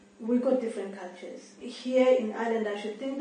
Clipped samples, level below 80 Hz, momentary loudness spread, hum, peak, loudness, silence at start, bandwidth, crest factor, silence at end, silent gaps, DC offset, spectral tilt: under 0.1%; -78 dBFS; 19 LU; none; -12 dBFS; -28 LUFS; 0.2 s; 9.8 kHz; 18 dB; 0 s; none; under 0.1%; -5.5 dB/octave